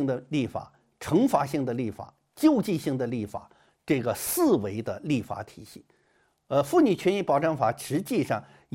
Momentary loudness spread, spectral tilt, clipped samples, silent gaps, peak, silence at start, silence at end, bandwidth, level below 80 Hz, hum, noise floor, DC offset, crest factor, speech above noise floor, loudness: 15 LU; -6 dB/octave; under 0.1%; none; -8 dBFS; 0 s; 0.3 s; 16.5 kHz; -62 dBFS; none; -68 dBFS; under 0.1%; 18 dB; 42 dB; -26 LUFS